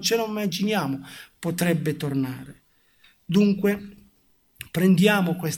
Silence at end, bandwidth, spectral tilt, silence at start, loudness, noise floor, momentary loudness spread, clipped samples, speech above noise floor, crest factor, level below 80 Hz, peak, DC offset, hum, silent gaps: 0 s; 17 kHz; -5.5 dB/octave; 0 s; -23 LUFS; -62 dBFS; 14 LU; under 0.1%; 39 dB; 18 dB; -62 dBFS; -6 dBFS; under 0.1%; none; none